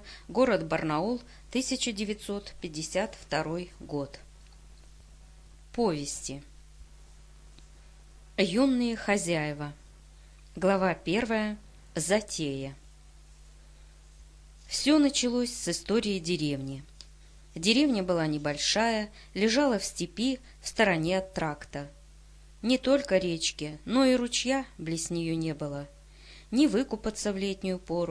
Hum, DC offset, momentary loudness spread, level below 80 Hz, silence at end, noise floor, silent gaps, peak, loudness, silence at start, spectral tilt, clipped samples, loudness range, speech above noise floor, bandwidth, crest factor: none; under 0.1%; 13 LU; -52 dBFS; 0 s; -53 dBFS; none; -8 dBFS; -29 LUFS; 0 s; -4 dB/octave; under 0.1%; 8 LU; 24 dB; 11 kHz; 22 dB